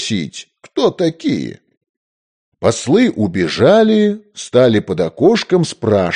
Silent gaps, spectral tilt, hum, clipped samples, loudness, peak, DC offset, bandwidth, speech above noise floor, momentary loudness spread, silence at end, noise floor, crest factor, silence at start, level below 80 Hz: 1.77-1.81 s, 1.89-2.52 s; -5.5 dB/octave; none; under 0.1%; -14 LUFS; 0 dBFS; under 0.1%; 10 kHz; over 76 dB; 11 LU; 0 s; under -90 dBFS; 14 dB; 0 s; -54 dBFS